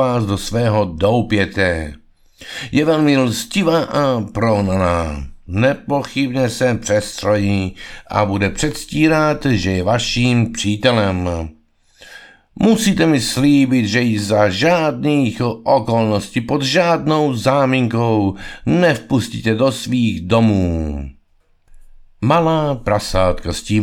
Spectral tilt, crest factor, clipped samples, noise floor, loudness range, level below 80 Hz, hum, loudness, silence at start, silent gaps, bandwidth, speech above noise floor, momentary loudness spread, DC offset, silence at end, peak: -5.5 dB/octave; 16 dB; under 0.1%; -55 dBFS; 3 LU; -36 dBFS; none; -16 LUFS; 0 s; none; 17.5 kHz; 40 dB; 8 LU; under 0.1%; 0 s; 0 dBFS